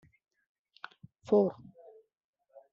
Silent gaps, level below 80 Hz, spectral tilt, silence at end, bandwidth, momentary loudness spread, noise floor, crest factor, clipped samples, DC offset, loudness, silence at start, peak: none; -78 dBFS; -7.5 dB/octave; 1.2 s; 7.2 kHz; 25 LU; -58 dBFS; 22 dB; under 0.1%; under 0.1%; -29 LUFS; 1.3 s; -14 dBFS